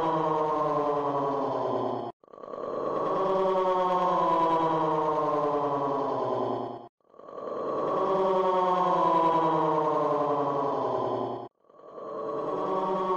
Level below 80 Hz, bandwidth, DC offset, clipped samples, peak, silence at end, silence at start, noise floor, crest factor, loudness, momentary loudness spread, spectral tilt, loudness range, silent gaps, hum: -66 dBFS; 8 kHz; under 0.1%; under 0.1%; -14 dBFS; 0 s; 0 s; -48 dBFS; 14 dB; -27 LUFS; 13 LU; -7.5 dB/octave; 4 LU; 2.13-2.20 s, 6.89-6.98 s; none